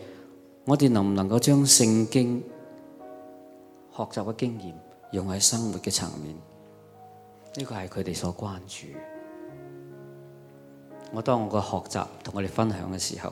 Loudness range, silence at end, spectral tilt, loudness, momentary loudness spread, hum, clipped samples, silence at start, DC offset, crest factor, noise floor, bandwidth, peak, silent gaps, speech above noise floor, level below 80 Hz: 14 LU; 0 s; -4 dB/octave; -25 LUFS; 24 LU; none; under 0.1%; 0 s; under 0.1%; 24 dB; -51 dBFS; 16 kHz; -4 dBFS; none; 25 dB; -62 dBFS